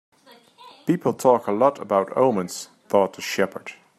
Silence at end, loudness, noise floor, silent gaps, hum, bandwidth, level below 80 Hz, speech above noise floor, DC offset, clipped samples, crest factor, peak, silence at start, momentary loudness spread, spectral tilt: 0.25 s; -22 LUFS; -52 dBFS; none; none; 14 kHz; -70 dBFS; 30 dB; under 0.1%; under 0.1%; 20 dB; -4 dBFS; 0.65 s; 13 LU; -5.5 dB/octave